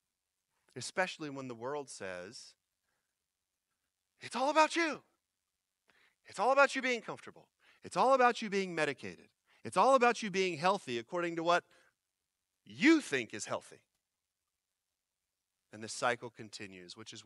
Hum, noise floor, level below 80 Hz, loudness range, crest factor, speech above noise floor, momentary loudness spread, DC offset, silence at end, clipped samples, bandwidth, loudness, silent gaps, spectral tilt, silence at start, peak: none; -89 dBFS; -88 dBFS; 11 LU; 24 dB; 56 dB; 21 LU; under 0.1%; 0.05 s; under 0.1%; 12 kHz; -32 LUFS; none; -4 dB/octave; 0.75 s; -12 dBFS